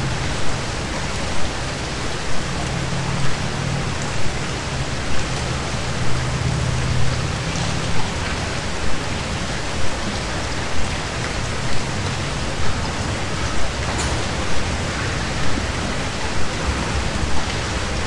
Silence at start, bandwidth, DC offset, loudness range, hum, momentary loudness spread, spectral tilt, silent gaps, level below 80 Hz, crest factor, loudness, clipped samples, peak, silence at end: 0 s; 11.5 kHz; 4%; 2 LU; none; 3 LU; -4 dB/octave; none; -30 dBFS; 14 dB; -23 LUFS; under 0.1%; -4 dBFS; 0 s